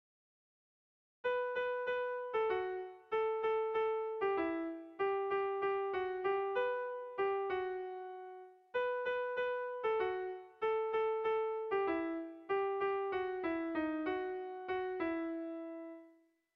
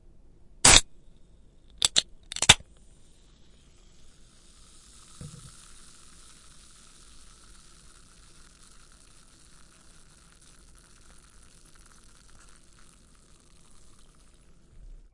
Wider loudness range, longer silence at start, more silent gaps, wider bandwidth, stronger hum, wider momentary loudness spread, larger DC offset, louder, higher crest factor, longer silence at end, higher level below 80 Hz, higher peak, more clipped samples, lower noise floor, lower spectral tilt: second, 2 LU vs 29 LU; first, 1.25 s vs 0.65 s; neither; second, 5.4 kHz vs 12 kHz; neither; second, 9 LU vs 30 LU; neither; second, -38 LUFS vs -20 LUFS; second, 14 dB vs 32 dB; second, 0.45 s vs 9.85 s; second, -74 dBFS vs -46 dBFS; second, -24 dBFS vs 0 dBFS; neither; first, -67 dBFS vs -56 dBFS; first, -6.5 dB/octave vs -0.5 dB/octave